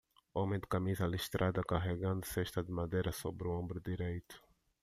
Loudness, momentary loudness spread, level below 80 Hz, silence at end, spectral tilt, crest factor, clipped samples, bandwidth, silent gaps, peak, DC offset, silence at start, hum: -38 LUFS; 7 LU; -56 dBFS; 0.45 s; -6 dB/octave; 18 dB; under 0.1%; 15 kHz; none; -20 dBFS; under 0.1%; 0.35 s; none